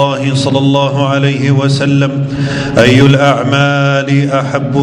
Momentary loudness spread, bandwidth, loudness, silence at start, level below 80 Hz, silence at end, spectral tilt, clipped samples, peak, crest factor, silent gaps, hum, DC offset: 7 LU; 10.5 kHz; -10 LUFS; 0 s; -40 dBFS; 0 s; -6.5 dB/octave; 1%; 0 dBFS; 10 dB; none; none; under 0.1%